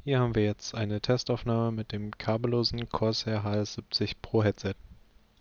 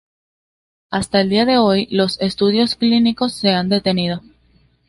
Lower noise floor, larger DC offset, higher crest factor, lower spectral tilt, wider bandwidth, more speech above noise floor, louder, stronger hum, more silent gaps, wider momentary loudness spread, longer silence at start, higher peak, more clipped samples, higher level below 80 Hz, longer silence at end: about the same, -56 dBFS vs -56 dBFS; neither; about the same, 18 dB vs 16 dB; about the same, -6 dB/octave vs -5.5 dB/octave; second, 7.2 kHz vs 11.5 kHz; second, 27 dB vs 40 dB; second, -30 LUFS vs -16 LUFS; neither; neither; about the same, 7 LU vs 8 LU; second, 0.05 s vs 0.9 s; second, -12 dBFS vs -2 dBFS; neither; about the same, -52 dBFS vs -50 dBFS; second, 0.5 s vs 0.7 s